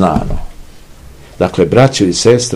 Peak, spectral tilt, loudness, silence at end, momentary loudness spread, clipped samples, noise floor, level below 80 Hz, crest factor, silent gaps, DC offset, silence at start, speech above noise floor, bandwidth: 0 dBFS; -5 dB/octave; -11 LUFS; 0 s; 12 LU; 1%; -35 dBFS; -28 dBFS; 12 dB; none; 0.7%; 0 s; 25 dB; 13 kHz